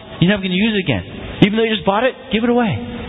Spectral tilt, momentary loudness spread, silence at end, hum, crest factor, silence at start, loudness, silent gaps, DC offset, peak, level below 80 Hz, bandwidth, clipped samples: -8.5 dB/octave; 6 LU; 0 s; none; 16 dB; 0 s; -17 LUFS; none; under 0.1%; 0 dBFS; -40 dBFS; 4 kHz; under 0.1%